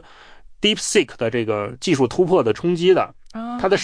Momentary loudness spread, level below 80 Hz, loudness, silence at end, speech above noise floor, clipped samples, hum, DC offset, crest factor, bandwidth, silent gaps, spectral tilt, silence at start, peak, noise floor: 7 LU; -50 dBFS; -19 LUFS; 0 s; 25 dB; under 0.1%; none; under 0.1%; 14 dB; 10.5 kHz; none; -4.5 dB/octave; 0.3 s; -4 dBFS; -43 dBFS